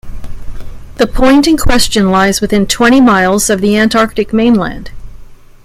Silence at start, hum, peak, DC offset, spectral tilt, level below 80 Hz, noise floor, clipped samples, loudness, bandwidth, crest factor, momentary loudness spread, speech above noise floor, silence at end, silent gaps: 0.05 s; none; 0 dBFS; under 0.1%; -4 dB/octave; -24 dBFS; -31 dBFS; under 0.1%; -10 LUFS; 16 kHz; 10 dB; 8 LU; 22 dB; 0.3 s; none